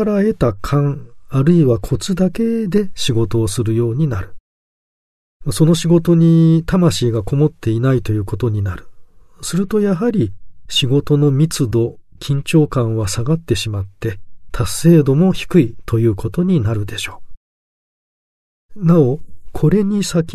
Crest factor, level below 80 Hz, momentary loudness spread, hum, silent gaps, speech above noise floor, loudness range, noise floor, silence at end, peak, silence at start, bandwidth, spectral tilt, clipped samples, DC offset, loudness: 16 dB; -36 dBFS; 12 LU; none; 4.40-5.40 s, 17.37-18.69 s; 23 dB; 5 LU; -38 dBFS; 0 s; 0 dBFS; 0 s; 13.5 kHz; -6.5 dB/octave; under 0.1%; under 0.1%; -16 LUFS